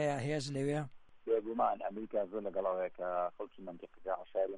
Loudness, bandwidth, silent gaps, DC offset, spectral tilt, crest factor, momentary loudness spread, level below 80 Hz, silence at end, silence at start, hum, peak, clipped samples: -37 LUFS; 11 kHz; none; under 0.1%; -6.5 dB/octave; 18 dB; 13 LU; -70 dBFS; 0 s; 0 s; none; -20 dBFS; under 0.1%